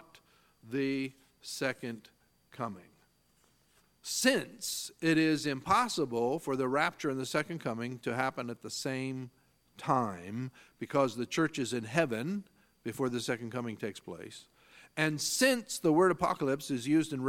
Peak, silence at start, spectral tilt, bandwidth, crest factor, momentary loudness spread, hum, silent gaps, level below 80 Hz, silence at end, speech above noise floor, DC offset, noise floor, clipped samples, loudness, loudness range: -10 dBFS; 0.65 s; -4 dB/octave; 17 kHz; 22 dB; 15 LU; none; none; -70 dBFS; 0 s; 37 dB; under 0.1%; -70 dBFS; under 0.1%; -32 LUFS; 6 LU